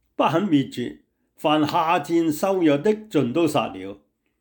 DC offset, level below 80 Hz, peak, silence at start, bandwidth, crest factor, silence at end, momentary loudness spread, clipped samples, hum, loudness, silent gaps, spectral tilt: under 0.1%; -64 dBFS; -8 dBFS; 0.2 s; 19.5 kHz; 14 dB; 0.45 s; 11 LU; under 0.1%; none; -22 LUFS; none; -6 dB/octave